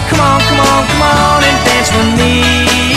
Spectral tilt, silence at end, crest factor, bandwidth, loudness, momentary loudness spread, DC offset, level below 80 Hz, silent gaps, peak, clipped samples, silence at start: -4 dB/octave; 0 s; 10 dB; 14.5 kHz; -9 LUFS; 1 LU; under 0.1%; -22 dBFS; none; 0 dBFS; 0.3%; 0 s